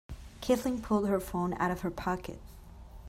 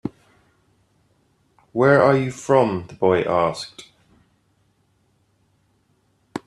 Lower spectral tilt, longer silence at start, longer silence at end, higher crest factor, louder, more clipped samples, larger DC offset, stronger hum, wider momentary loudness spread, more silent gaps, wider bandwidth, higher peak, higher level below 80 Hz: about the same, -6 dB/octave vs -6.5 dB/octave; about the same, 0.1 s vs 0.05 s; about the same, 0 s vs 0.1 s; about the same, 18 dB vs 22 dB; second, -32 LUFS vs -19 LUFS; neither; neither; neither; about the same, 21 LU vs 19 LU; neither; first, 16 kHz vs 12 kHz; second, -14 dBFS vs -2 dBFS; first, -50 dBFS vs -60 dBFS